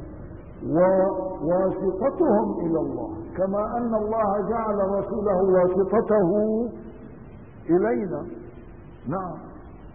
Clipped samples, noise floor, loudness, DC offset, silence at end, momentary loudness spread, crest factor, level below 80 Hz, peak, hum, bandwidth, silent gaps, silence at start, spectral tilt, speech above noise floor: under 0.1%; -43 dBFS; -24 LUFS; 0.3%; 0 s; 21 LU; 16 dB; -48 dBFS; -8 dBFS; none; 2.9 kHz; none; 0 s; -14 dB/octave; 21 dB